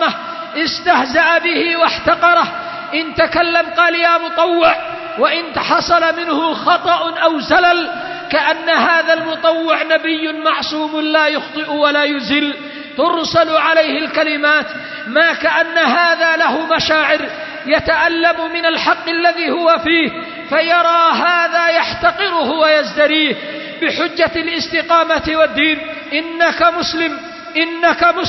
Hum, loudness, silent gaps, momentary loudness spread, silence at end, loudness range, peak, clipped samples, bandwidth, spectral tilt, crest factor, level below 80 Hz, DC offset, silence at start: none; -14 LUFS; none; 8 LU; 0 s; 2 LU; 0 dBFS; under 0.1%; 6.2 kHz; -3.5 dB/octave; 14 dB; -48 dBFS; under 0.1%; 0 s